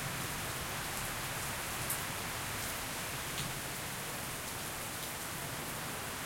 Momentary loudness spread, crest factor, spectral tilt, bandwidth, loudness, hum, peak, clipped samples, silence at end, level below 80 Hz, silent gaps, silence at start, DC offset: 3 LU; 22 dB; -2.5 dB/octave; 16.5 kHz; -38 LUFS; none; -18 dBFS; under 0.1%; 0 s; -56 dBFS; none; 0 s; under 0.1%